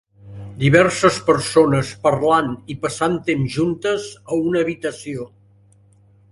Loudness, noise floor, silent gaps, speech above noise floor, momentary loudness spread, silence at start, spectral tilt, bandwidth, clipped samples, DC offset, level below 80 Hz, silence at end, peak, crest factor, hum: -18 LUFS; -52 dBFS; none; 34 dB; 15 LU; 0.25 s; -5.5 dB/octave; 11.5 kHz; under 0.1%; under 0.1%; -50 dBFS; 1.05 s; 0 dBFS; 20 dB; none